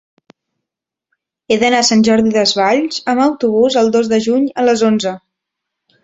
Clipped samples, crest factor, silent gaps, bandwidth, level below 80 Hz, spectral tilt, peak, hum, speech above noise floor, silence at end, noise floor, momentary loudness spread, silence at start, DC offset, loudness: under 0.1%; 14 dB; none; 8 kHz; -54 dBFS; -4 dB/octave; -2 dBFS; none; 70 dB; 0.85 s; -83 dBFS; 6 LU; 1.5 s; under 0.1%; -13 LUFS